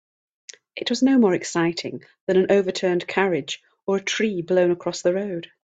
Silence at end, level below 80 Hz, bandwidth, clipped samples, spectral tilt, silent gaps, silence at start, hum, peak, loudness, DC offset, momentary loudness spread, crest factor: 0.2 s; -66 dBFS; 8.4 kHz; under 0.1%; -5 dB/octave; 2.21-2.27 s; 0.75 s; none; -4 dBFS; -22 LUFS; under 0.1%; 12 LU; 18 dB